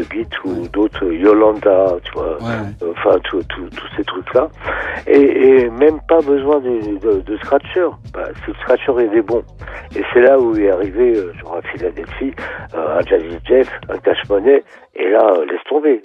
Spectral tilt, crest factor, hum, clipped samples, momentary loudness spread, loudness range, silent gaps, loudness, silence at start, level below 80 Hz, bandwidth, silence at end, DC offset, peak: -7.5 dB/octave; 14 dB; none; under 0.1%; 14 LU; 4 LU; none; -15 LUFS; 0 s; -38 dBFS; 5.6 kHz; 0.05 s; under 0.1%; 0 dBFS